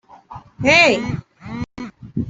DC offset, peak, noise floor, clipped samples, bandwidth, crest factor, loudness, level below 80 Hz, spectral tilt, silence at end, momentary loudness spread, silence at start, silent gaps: under 0.1%; -2 dBFS; -40 dBFS; under 0.1%; 8.2 kHz; 18 dB; -14 LUFS; -46 dBFS; -4.5 dB/octave; 0 s; 21 LU; 0.3 s; none